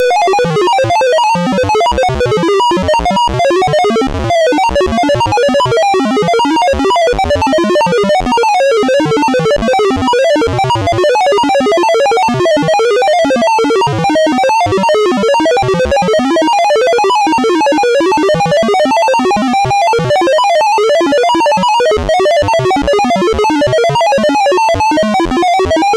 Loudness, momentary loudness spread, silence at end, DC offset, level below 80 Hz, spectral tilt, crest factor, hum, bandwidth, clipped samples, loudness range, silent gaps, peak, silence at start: -10 LUFS; 2 LU; 0 s; under 0.1%; -32 dBFS; -5 dB/octave; 6 dB; none; 13.5 kHz; under 0.1%; 1 LU; none; -4 dBFS; 0 s